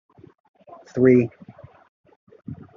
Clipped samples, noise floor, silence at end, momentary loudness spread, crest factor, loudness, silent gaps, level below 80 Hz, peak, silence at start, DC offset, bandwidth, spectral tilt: under 0.1%; -46 dBFS; 0.25 s; 24 LU; 22 dB; -19 LUFS; 1.88-2.04 s, 2.16-2.27 s; -66 dBFS; -4 dBFS; 0.95 s; under 0.1%; 6.6 kHz; -10 dB/octave